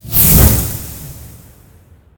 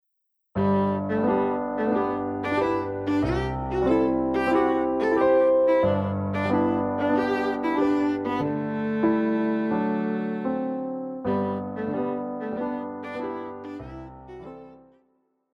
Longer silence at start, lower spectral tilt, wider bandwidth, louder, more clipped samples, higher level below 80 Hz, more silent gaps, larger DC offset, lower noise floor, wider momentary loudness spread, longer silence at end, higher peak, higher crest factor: second, 0.05 s vs 0.55 s; second, -4.5 dB/octave vs -8.5 dB/octave; first, over 20 kHz vs 9.4 kHz; first, -9 LUFS vs -25 LUFS; first, 0.3% vs under 0.1%; first, -20 dBFS vs -48 dBFS; neither; neither; second, -45 dBFS vs -76 dBFS; first, 23 LU vs 12 LU; first, 0.9 s vs 0.75 s; first, 0 dBFS vs -10 dBFS; about the same, 14 dB vs 14 dB